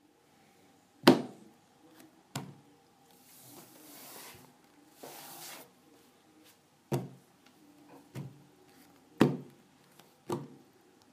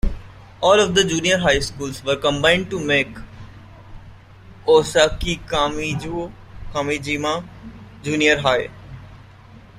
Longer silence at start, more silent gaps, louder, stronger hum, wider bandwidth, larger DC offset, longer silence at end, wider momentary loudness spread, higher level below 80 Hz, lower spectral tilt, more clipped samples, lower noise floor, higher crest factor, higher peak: first, 1.05 s vs 0.05 s; neither; second, -33 LUFS vs -19 LUFS; neither; about the same, 15.5 kHz vs 15.5 kHz; neither; first, 0.65 s vs 0.2 s; first, 29 LU vs 23 LU; second, -76 dBFS vs -36 dBFS; first, -5.5 dB/octave vs -3.5 dB/octave; neither; first, -65 dBFS vs -44 dBFS; first, 36 dB vs 20 dB; about the same, -2 dBFS vs -2 dBFS